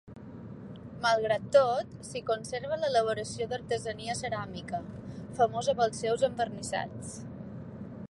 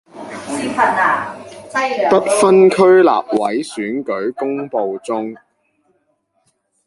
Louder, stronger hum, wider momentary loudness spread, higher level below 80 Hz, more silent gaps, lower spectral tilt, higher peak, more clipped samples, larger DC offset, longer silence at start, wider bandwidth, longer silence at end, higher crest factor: second, -30 LUFS vs -15 LUFS; neither; about the same, 17 LU vs 15 LU; about the same, -58 dBFS vs -62 dBFS; neither; about the same, -4.5 dB/octave vs -5 dB/octave; second, -10 dBFS vs -2 dBFS; neither; neither; about the same, 0.05 s vs 0.15 s; about the same, 11.5 kHz vs 11.5 kHz; second, 0.05 s vs 1.5 s; first, 20 dB vs 14 dB